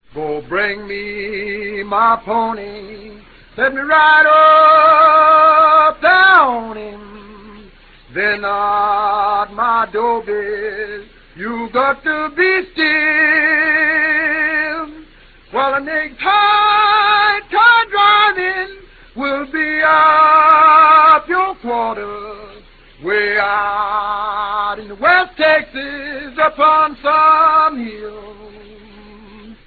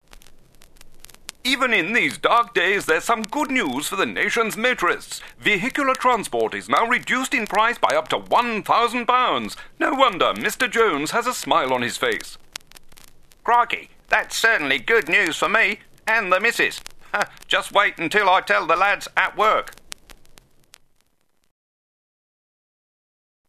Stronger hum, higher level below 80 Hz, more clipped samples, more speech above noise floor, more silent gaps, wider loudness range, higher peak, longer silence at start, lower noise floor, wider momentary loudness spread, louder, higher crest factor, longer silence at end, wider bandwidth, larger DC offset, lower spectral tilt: neither; first, -46 dBFS vs -52 dBFS; neither; second, 30 dB vs 47 dB; neither; first, 9 LU vs 4 LU; about the same, 0 dBFS vs -2 dBFS; about the same, 0.15 s vs 0.15 s; second, -44 dBFS vs -68 dBFS; first, 17 LU vs 10 LU; first, -12 LUFS vs -20 LUFS; second, 14 dB vs 20 dB; second, 0.15 s vs 3.55 s; second, 4.8 kHz vs 14 kHz; neither; first, -6 dB/octave vs -2.5 dB/octave